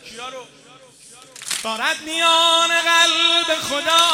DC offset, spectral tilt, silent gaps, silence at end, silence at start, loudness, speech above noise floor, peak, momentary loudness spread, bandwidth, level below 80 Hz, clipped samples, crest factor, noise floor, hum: under 0.1%; 0.5 dB/octave; none; 0 s; 0.05 s; -16 LUFS; 28 dB; -2 dBFS; 19 LU; 16.5 kHz; -64 dBFS; under 0.1%; 18 dB; -46 dBFS; none